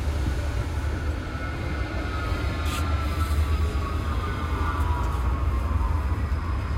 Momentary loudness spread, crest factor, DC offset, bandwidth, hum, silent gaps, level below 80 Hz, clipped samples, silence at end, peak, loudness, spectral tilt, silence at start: 4 LU; 12 dB; under 0.1%; 15 kHz; none; none; -28 dBFS; under 0.1%; 0 s; -12 dBFS; -27 LUFS; -6.5 dB/octave; 0 s